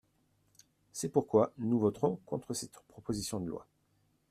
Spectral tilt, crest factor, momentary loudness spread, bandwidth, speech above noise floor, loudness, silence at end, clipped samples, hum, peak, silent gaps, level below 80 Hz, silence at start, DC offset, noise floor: -6 dB/octave; 22 dB; 17 LU; 15 kHz; 41 dB; -34 LUFS; 0.7 s; under 0.1%; none; -12 dBFS; none; -66 dBFS; 0.95 s; under 0.1%; -74 dBFS